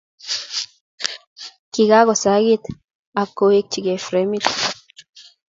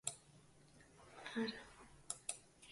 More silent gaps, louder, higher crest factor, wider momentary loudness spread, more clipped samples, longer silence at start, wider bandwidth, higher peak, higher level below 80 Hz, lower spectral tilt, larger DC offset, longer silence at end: first, 0.81-0.98 s, 1.27-1.36 s, 1.59-1.72 s, 2.95-3.13 s vs none; first, -19 LUFS vs -47 LUFS; second, 20 dB vs 28 dB; second, 19 LU vs 22 LU; neither; first, 0.25 s vs 0.05 s; second, 7.8 kHz vs 11.5 kHz; first, 0 dBFS vs -22 dBFS; first, -60 dBFS vs -76 dBFS; about the same, -3.5 dB/octave vs -2.5 dB/octave; neither; first, 0.25 s vs 0 s